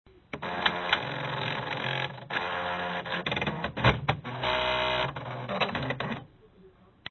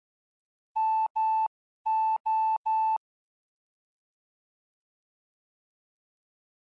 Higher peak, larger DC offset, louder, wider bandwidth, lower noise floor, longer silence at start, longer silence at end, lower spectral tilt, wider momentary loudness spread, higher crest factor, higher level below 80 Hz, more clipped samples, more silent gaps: first, -8 dBFS vs -22 dBFS; neither; about the same, -30 LUFS vs -28 LUFS; first, 6.4 kHz vs 4.7 kHz; second, -57 dBFS vs under -90 dBFS; second, 0.15 s vs 0.75 s; second, 0 s vs 3.7 s; first, -5.5 dB/octave vs -0.5 dB/octave; about the same, 9 LU vs 7 LU; first, 22 dB vs 10 dB; first, -50 dBFS vs -86 dBFS; neither; second, none vs 1.10-1.15 s, 1.47-1.85 s, 2.20-2.24 s, 2.57-2.64 s